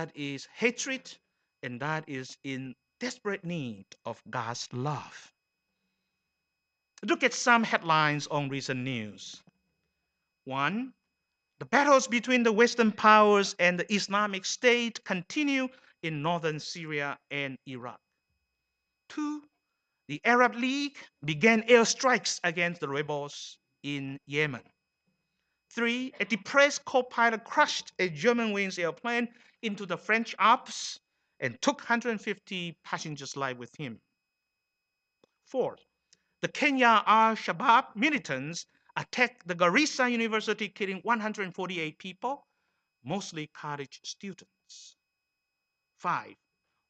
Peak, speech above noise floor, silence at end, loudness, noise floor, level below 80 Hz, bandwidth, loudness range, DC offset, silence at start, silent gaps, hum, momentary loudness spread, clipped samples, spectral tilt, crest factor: -6 dBFS; 55 dB; 0.55 s; -28 LUFS; -84 dBFS; -78 dBFS; 9 kHz; 14 LU; under 0.1%; 0 s; none; none; 17 LU; under 0.1%; -3.5 dB/octave; 24 dB